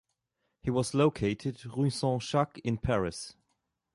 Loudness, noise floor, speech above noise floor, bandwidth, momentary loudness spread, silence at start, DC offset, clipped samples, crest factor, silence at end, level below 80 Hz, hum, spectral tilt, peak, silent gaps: -31 LUFS; -81 dBFS; 52 dB; 11.5 kHz; 9 LU; 0.65 s; under 0.1%; under 0.1%; 18 dB; 0.65 s; -52 dBFS; none; -6 dB/octave; -12 dBFS; none